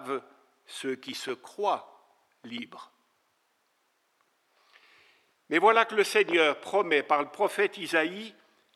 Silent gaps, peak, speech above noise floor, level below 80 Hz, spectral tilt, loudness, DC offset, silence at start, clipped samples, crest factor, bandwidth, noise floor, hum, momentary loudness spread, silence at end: none; -6 dBFS; 45 dB; under -90 dBFS; -3 dB/octave; -27 LUFS; under 0.1%; 0 s; under 0.1%; 24 dB; 14 kHz; -73 dBFS; none; 18 LU; 0.45 s